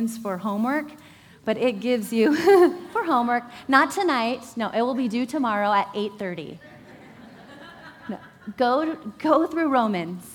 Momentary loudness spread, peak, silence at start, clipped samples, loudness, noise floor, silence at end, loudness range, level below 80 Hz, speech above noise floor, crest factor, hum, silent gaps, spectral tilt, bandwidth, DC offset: 18 LU; -2 dBFS; 0 s; under 0.1%; -23 LUFS; -46 dBFS; 0 s; 8 LU; -66 dBFS; 23 dB; 22 dB; none; none; -5 dB/octave; over 20 kHz; under 0.1%